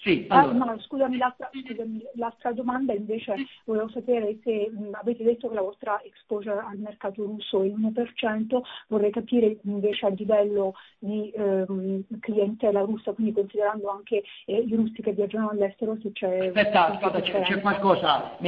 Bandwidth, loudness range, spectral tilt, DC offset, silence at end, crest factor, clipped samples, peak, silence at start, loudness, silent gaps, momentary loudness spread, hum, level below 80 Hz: 5.2 kHz; 4 LU; -8.5 dB/octave; under 0.1%; 0 s; 22 dB; under 0.1%; -4 dBFS; 0 s; -26 LUFS; none; 10 LU; none; -64 dBFS